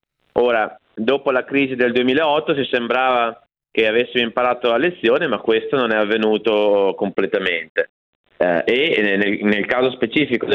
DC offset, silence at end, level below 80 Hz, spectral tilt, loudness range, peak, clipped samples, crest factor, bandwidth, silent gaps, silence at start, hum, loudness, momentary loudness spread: under 0.1%; 0 s; -60 dBFS; -7 dB/octave; 1 LU; -2 dBFS; under 0.1%; 16 dB; 6.4 kHz; 7.69-7.75 s, 7.89-8.24 s; 0.35 s; none; -18 LUFS; 5 LU